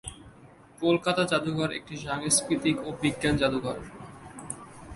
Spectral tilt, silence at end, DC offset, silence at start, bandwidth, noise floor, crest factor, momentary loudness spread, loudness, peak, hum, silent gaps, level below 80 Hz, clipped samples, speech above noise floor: -4 dB/octave; 0 s; under 0.1%; 0.05 s; 12 kHz; -52 dBFS; 20 dB; 18 LU; -27 LUFS; -8 dBFS; none; none; -52 dBFS; under 0.1%; 25 dB